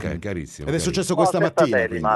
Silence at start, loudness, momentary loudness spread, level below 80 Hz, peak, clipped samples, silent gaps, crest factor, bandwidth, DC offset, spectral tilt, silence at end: 0 s; -21 LUFS; 11 LU; -44 dBFS; -4 dBFS; under 0.1%; none; 16 dB; 12 kHz; under 0.1%; -5 dB/octave; 0 s